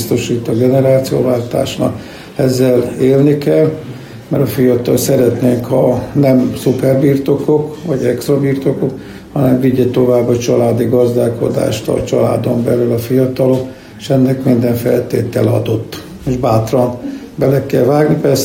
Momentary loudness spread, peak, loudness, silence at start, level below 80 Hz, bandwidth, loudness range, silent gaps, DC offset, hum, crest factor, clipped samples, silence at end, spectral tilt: 8 LU; 0 dBFS; -13 LUFS; 0 s; -42 dBFS; 16.5 kHz; 2 LU; none; under 0.1%; none; 12 dB; under 0.1%; 0 s; -7 dB/octave